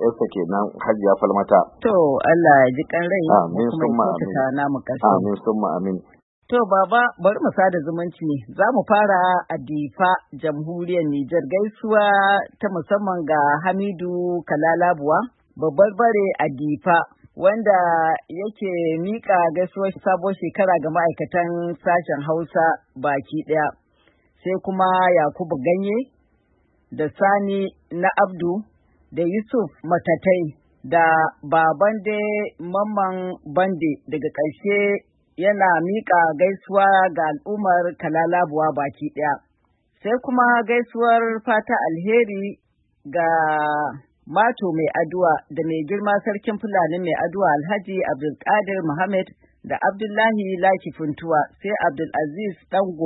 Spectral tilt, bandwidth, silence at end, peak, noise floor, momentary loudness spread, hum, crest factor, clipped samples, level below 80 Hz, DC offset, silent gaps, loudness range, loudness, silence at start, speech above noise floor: -11.5 dB/octave; 4.1 kHz; 0 s; 0 dBFS; -65 dBFS; 9 LU; none; 20 dB; under 0.1%; -64 dBFS; under 0.1%; 6.23-6.42 s; 4 LU; -20 LUFS; 0 s; 46 dB